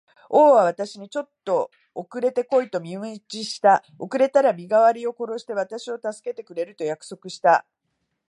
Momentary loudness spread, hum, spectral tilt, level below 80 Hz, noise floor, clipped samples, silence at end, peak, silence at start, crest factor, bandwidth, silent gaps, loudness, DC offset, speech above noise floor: 15 LU; none; -4.5 dB/octave; -82 dBFS; -76 dBFS; under 0.1%; 0.7 s; -4 dBFS; 0.3 s; 18 dB; 11 kHz; none; -22 LUFS; under 0.1%; 54 dB